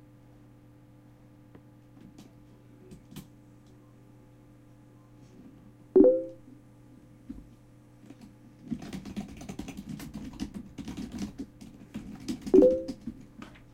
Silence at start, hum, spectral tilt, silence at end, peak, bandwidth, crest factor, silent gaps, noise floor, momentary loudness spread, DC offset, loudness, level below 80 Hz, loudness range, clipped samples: 2.2 s; none; -7.5 dB/octave; 0.3 s; -6 dBFS; 15 kHz; 26 dB; none; -55 dBFS; 31 LU; under 0.1%; -29 LUFS; -56 dBFS; 23 LU; under 0.1%